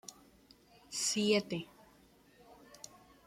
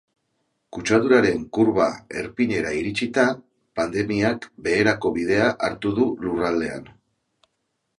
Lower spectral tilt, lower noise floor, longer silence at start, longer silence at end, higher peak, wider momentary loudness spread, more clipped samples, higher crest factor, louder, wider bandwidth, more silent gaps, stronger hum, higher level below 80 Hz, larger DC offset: second, -3 dB/octave vs -5.5 dB/octave; second, -64 dBFS vs -75 dBFS; second, 0.1 s vs 0.75 s; second, 0.4 s vs 1.15 s; second, -16 dBFS vs -2 dBFS; first, 22 LU vs 12 LU; neither; about the same, 22 dB vs 20 dB; second, -34 LUFS vs -22 LUFS; first, 16 kHz vs 11.5 kHz; neither; neither; second, -74 dBFS vs -52 dBFS; neither